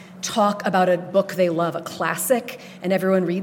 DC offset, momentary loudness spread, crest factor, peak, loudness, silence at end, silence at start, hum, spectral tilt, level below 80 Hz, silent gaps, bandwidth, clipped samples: under 0.1%; 6 LU; 16 dB; -6 dBFS; -21 LUFS; 0 s; 0 s; none; -5 dB/octave; -70 dBFS; none; 17.5 kHz; under 0.1%